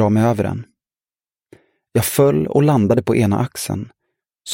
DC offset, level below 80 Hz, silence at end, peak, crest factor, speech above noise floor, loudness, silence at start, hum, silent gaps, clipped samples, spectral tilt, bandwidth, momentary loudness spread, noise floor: under 0.1%; -50 dBFS; 0 s; -2 dBFS; 16 dB; over 74 dB; -17 LUFS; 0 s; none; none; under 0.1%; -6.5 dB/octave; 17 kHz; 13 LU; under -90 dBFS